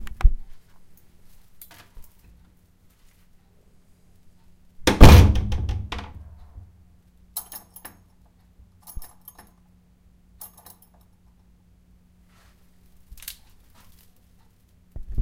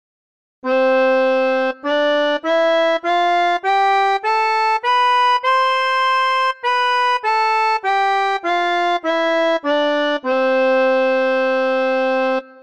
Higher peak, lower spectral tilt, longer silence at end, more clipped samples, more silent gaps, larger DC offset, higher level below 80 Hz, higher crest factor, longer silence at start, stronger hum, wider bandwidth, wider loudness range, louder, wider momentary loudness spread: first, 0 dBFS vs -8 dBFS; first, -6 dB/octave vs -1.5 dB/octave; about the same, 0 s vs 0.1 s; neither; neither; second, under 0.1% vs 0.4%; first, -26 dBFS vs -68 dBFS; first, 24 dB vs 10 dB; second, 0 s vs 0.65 s; neither; first, 16.5 kHz vs 10 kHz; first, 22 LU vs 1 LU; second, -19 LUFS vs -16 LUFS; first, 33 LU vs 3 LU